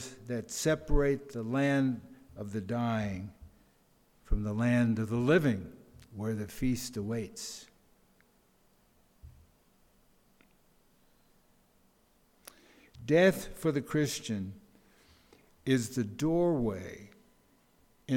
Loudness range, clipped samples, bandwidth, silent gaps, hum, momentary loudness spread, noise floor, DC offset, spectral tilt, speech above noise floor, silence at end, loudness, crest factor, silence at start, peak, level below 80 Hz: 7 LU; under 0.1%; 18 kHz; none; none; 18 LU; -68 dBFS; under 0.1%; -6 dB/octave; 37 dB; 0 s; -32 LUFS; 20 dB; 0 s; -14 dBFS; -46 dBFS